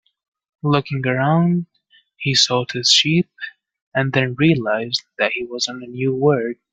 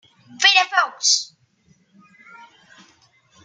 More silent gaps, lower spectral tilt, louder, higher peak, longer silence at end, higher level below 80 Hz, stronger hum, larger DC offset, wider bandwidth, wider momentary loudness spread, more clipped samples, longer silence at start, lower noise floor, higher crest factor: first, 3.82-3.92 s vs none; first, -4.5 dB/octave vs 2.5 dB/octave; about the same, -18 LUFS vs -16 LUFS; about the same, 0 dBFS vs -2 dBFS; second, 0.2 s vs 2.2 s; first, -58 dBFS vs -84 dBFS; neither; neither; second, 9.4 kHz vs 13 kHz; first, 12 LU vs 6 LU; neither; first, 0.65 s vs 0.4 s; about the same, -57 dBFS vs -60 dBFS; about the same, 20 dB vs 22 dB